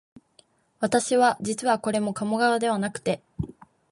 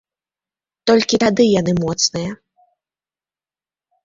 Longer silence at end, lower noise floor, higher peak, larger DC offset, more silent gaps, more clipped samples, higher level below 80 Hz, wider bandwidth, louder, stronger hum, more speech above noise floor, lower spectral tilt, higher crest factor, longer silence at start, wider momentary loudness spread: second, 0.4 s vs 1.7 s; second, -61 dBFS vs under -90 dBFS; second, -8 dBFS vs -2 dBFS; neither; neither; neither; about the same, -56 dBFS vs -52 dBFS; first, 11.5 kHz vs 7.8 kHz; second, -24 LUFS vs -16 LUFS; neither; second, 37 dB vs over 74 dB; about the same, -4.5 dB/octave vs -4.5 dB/octave; about the same, 18 dB vs 18 dB; about the same, 0.8 s vs 0.85 s; about the same, 10 LU vs 10 LU